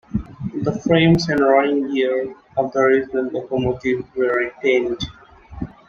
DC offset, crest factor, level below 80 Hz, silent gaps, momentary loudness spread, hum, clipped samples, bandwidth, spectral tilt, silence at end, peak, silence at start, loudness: under 0.1%; 18 dB; -44 dBFS; none; 12 LU; none; under 0.1%; 7.2 kHz; -6.5 dB/octave; 0.2 s; -2 dBFS; 0.15 s; -19 LUFS